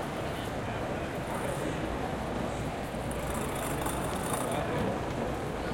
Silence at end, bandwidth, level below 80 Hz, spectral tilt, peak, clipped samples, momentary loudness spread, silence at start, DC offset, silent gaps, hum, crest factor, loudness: 0 s; 17 kHz; -44 dBFS; -5 dB/octave; -16 dBFS; under 0.1%; 3 LU; 0 s; under 0.1%; none; none; 16 dB; -33 LUFS